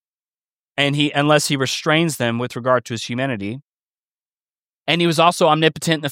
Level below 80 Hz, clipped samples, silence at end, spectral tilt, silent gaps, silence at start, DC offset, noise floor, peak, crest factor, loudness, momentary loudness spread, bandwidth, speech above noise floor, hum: -64 dBFS; under 0.1%; 0 s; -4.5 dB/octave; 3.63-3.88 s, 3.99-4.18 s, 4.25-4.86 s; 0.75 s; under 0.1%; under -90 dBFS; 0 dBFS; 20 dB; -18 LUFS; 12 LU; 16.5 kHz; over 72 dB; none